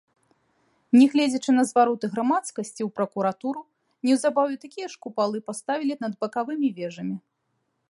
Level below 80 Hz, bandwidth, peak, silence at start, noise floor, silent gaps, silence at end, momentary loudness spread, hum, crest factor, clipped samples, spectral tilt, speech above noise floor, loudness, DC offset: -78 dBFS; 11.5 kHz; -6 dBFS; 0.95 s; -75 dBFS; none; 0.7 s; 14 LU; none; 18 dB; under 0.1%; -5 dB/octave; 51 dB; -24 LUFS; under 0.1%